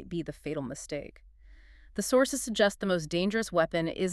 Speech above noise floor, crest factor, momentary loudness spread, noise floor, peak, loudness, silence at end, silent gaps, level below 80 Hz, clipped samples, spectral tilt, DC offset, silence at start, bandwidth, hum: 24 dB; 20 dB; 13 LU; -54 dBFS; -10 dBFS; -30 LUFS; 0 s; none; -54 dBFS; under 0.1%; -4.5 dB/octave; under 0.1%; 0 s; 13.5 kHz; none